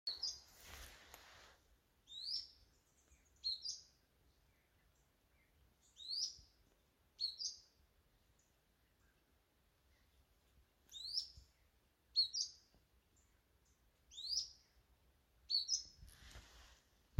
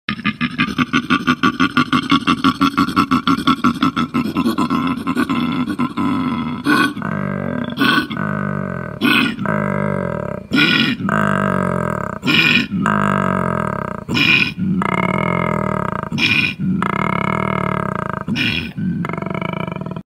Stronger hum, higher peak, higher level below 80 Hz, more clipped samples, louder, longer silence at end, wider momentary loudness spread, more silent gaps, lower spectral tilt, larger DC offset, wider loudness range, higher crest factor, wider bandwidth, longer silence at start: neither; second, -26 dBFS vs 0 dBFS; second, -72 dBFS vs -46 dBFS; neither; second, -42 LUFS vs -17 LUFS; about the same, 0 s vs 0.05 s; first, 23 LU vs 8 LU; neither; second, 1 dB/octave vs -5.5 dB/octave; neither; first, 8 LU vs 3 LU; first, 26 dB vs 18 dB; about the same, 16.5 kHz vs 16 kHz; about the same, 0.05 s vs 0.1 s